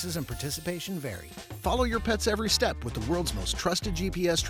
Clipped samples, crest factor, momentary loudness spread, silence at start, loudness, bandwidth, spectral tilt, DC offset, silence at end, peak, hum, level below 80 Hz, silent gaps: under 0.1%; 18 dB; 9 LU; 0 s; -29 LUFS; 17 kHz; -4 dB/octave; under 0.1%; 0 s; -12 dBFS; none; -38 dBFS; none